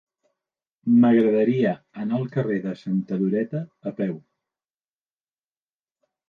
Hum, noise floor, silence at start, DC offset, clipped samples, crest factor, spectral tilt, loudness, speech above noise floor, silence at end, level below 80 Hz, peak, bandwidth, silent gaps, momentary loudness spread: none; under -90 dBFS; 0.85 s; under 0.1%; under 0.1%; 16 dB; -10 dB/octave; -23 LUFS; over 68 dB; 2.1 s; -72 dBFS; -8 dBFS; 4.8 kHz; none; 14 LU